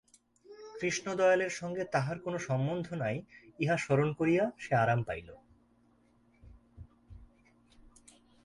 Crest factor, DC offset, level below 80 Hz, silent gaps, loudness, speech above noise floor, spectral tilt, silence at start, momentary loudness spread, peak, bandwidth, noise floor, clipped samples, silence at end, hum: 20 dB; under 0.1%; -62 dBFS; none; -32 LUFS; 36 dB; -6 dB/octave; 0.5 s; 10 LU; -14 dBFS; 11.5 kHz; -67 dBFS; under 0.1%; 1.2 s; none